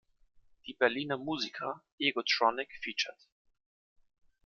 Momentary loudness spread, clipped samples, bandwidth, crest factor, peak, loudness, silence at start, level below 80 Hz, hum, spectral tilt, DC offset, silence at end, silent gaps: 11 LU; under 0.1%; 7.2 kHz; 24 dB; -12 dBFS; -32 LUFS; 0.65 s; -74 dBFS; none; -3 dB/octave; under 0.1%; 1.35 s; 1.92-1.98 s